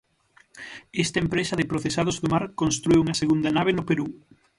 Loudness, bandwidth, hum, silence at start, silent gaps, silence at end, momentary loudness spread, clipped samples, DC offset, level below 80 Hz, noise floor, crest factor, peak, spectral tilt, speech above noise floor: -24 LUFS; 11.5 kHz; none; 0.55 s; none; 0.4 s; 12 LU; under 0.1%; under 0.1%; -50 dBFS; -60 dBFS; 16 dB; -8 dBFS; -5 dB/octave; 36 dB